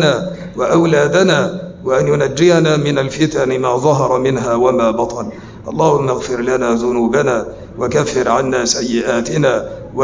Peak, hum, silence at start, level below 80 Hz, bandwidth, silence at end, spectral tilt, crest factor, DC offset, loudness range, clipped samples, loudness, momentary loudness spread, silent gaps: -2 dBFS; none; 0 s; -42 dBFS; 7.6 kHz; 0 s; -5 dB/octave; 14 dB; under 0.1%; 2 LU; under 0.1%; -14 LUFS; 9 LU; none